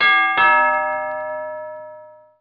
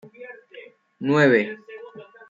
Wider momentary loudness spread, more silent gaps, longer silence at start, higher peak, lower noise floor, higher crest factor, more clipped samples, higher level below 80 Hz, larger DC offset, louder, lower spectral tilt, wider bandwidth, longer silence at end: second, 19 LU vs 25 LU; neither; second, 0 s vs 0.2 s; about the same, -4 dBFS vs -4 dBFS; second, -42 dBFS vs -46 dBFS; about the same, 16 dB vs 20 dB; neither; first, -68 dBFS vs -76 dBFS; neither; first, -17 LUFS vs -20 LUFS; second, -4 dB/octave vs -7 dB/octave; second, 5.2 kHz vs 7.6 kHz; about the same, 0.3 s vs 0.25 s